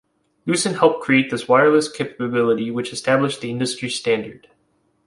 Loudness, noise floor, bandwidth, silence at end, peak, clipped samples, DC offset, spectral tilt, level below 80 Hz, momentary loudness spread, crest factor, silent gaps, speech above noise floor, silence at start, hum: -19 LUFS; -65 dBFS; 11.5 kHz; 0.7 s; -2 dBFS; under 0.1%; under 0.1%; -4.5 dB/octave; -62 dBFS; 9 LU; 18 dB; none; 46 dB; 0.45 s; none